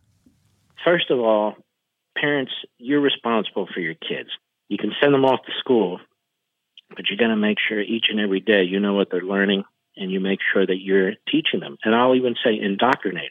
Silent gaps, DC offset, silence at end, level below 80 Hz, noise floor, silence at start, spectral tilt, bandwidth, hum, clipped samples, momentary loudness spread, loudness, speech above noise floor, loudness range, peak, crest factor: none; under 0.1%; 0 s; -74 dBFS; -78 dBFS; 0.8 s; -7.5 dB/octave; 5.4 kHz; none; under 0.1%; 10 LU; -21 LUFS; 57 dB; 2 LU; -2 dBFS; 20 dB